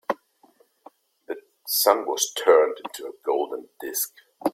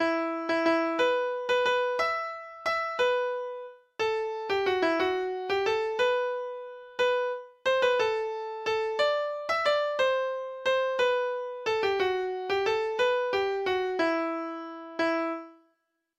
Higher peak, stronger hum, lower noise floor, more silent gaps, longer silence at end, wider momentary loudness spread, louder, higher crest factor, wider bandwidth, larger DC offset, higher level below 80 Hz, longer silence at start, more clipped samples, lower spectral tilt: first, -2 dBFS vs -14 dBFS; neither; second, -60 dBFS vs -76 dBFS; neither; second, 0.05 s vs 0.65 s; first, 18 LU vs 8 LU; first, -23 LUFS vs -28 LUFS; first, 22 dB vs 16 dB; first, 16.5 kHz vs 11.5 kHz; neither; second, -76 dBFS vs -66 dBFS; about the same, 0.1 s vs 0 s; neither; second, -0.5 dB/octave vs -3.5 dB/octave